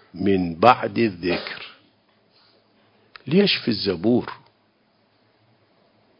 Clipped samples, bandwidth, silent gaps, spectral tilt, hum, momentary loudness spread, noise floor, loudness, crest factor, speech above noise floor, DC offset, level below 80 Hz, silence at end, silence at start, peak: under 0.1%; 7 kHz; none; -8 dB/octave; none; 20 LU; -63 dBFS; -21 LUFS; 24 dB; 43 dB; under 0.1%; -54 dBFS; 1.85 s; 0.15 s; 0 dBFS